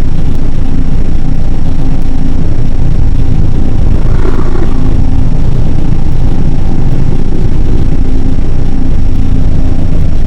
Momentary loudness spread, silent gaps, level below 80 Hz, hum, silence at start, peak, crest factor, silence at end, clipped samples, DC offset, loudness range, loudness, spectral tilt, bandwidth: 3 LU; none; -6 dBFS; none; 0 s; 0 dBFS; 4 dB; 0 s; 10%; 3%; 1 LU; -13 LUFS; -8.5 dB/octave; 3 kHz